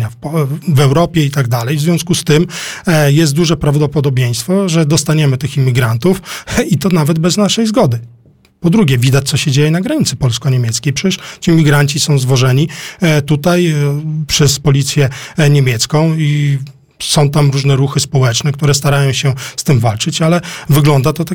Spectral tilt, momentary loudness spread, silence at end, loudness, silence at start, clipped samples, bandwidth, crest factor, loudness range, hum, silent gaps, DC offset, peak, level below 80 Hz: -5.5 dB/octave; 6 LU; 0 s; -12 LUFS; 0 s; under 0.1%; 17.5 kHz; 10 dB; 1 LU; none; none; 0.4%; 0 dBFS; -38 dBFS